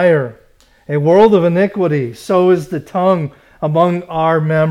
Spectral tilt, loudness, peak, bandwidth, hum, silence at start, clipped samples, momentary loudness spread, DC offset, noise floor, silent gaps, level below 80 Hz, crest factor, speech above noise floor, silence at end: -8 dB/octave; -14 LUFS; 0 dBFS; 13 kHz; none; 0 s; under 0.1%; 11 LU; under 0.1%; -49 dBFS; none; -50 dBFS; 12 dB; 36 dB; 0 s